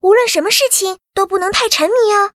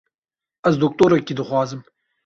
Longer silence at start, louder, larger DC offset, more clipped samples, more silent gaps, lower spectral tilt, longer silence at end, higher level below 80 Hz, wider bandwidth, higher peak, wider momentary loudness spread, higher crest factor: second, 0.05 s vs 0.65 s; first, -13 LUFS vs -19 LUFS; neither; neither; neither; second, -0.5 dB/octave vs -7 dB/octave; second, 0.05 s vs 0.45 s; first, -50 dBFS vs -56 dBFS; first, 16.5 kHz vs 7.6 kHz; first, 0 dBFS vs -4 dBFS; second, 6 LU vs 10 LU; about the same, 14 dB vs 18 dB